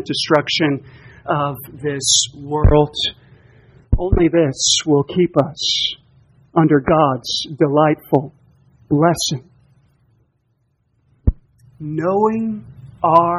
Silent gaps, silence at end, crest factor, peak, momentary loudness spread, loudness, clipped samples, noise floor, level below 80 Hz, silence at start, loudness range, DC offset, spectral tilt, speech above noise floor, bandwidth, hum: none; 0 s; 18 dB; 0 dBFS; 11 LU; -17 LUFS; under 0.1%; -65 dBFS; -30 dBFS; 0 s; 7 LU; under 0.1%; -4.5 dB/octave; 48 dB; 13 kHz; none